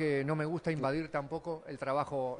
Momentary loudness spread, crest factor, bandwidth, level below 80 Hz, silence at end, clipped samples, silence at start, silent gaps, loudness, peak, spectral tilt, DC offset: 7 LU; 16 dB; 10.5 kHz; -64 dBFS; 0 s; under 0.1%; 0 s; none; -35 LUFS; -18 dBFS; -7.5 dB/octave; under 0.1%